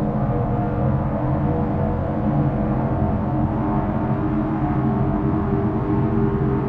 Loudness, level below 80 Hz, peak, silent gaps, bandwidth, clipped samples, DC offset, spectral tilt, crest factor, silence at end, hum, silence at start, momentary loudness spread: -21 LUFS; -32 dBFS; -8 dBFS; none; 4.2 kHz; under 0.1%; under 0.1%; -11.5 dB/octave; 12 dB; 0 s; none; 0 s; 2 LU